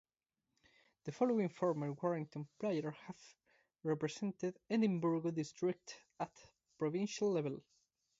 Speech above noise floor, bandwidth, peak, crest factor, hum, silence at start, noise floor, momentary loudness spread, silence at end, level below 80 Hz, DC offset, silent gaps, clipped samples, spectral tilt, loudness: over 51 dB; 7.6 kHz; -22 dBFS; 18 dB; none; 1.05 s; under -90 dBFS; 15 LU; 0.6 s; -82 dBFS; under 0.1%; none; under 0.1%; -6.5 dB/octave; -39 LUFS